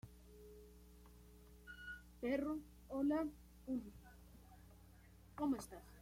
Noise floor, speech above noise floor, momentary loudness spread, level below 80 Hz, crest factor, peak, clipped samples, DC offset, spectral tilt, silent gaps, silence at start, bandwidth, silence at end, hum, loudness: -64 dBFS; 22 dB; 23 LU; -64 dBFS; 16 dB; -30 dBFS; under 0.1%; under 0.1%; -6 dB/octave; none; 0.05 s; 16.5 kHz; 0 s; none; -44 LUFS